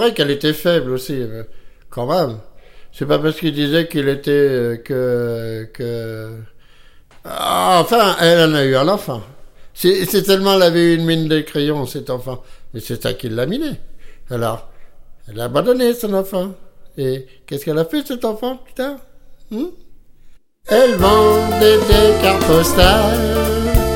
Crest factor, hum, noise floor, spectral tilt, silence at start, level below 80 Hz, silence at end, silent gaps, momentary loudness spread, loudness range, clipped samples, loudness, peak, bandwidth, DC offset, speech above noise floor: 16 dB; none; -43 dBFS; -5 dB/octave; 0 s; -30 dBFS; 0 s; none; 17 LU; 10 LU; under 0.1%; -16 LUFS; 0 dBFS; 17 kHz; under 0.1%; 27 dB